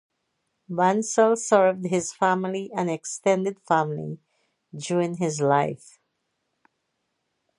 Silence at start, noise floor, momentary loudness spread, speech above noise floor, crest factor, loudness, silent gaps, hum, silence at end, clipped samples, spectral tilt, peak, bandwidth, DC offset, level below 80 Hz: 0.7 s; -77 dBFS; 14 LU; 54 dB; 20 dB; -24 LUFS; none; none; 1.85 s; under 0.1%; -5 dB/octave; -4 dBFS; 11.5 kHz; under 0.1%; -72 dBFS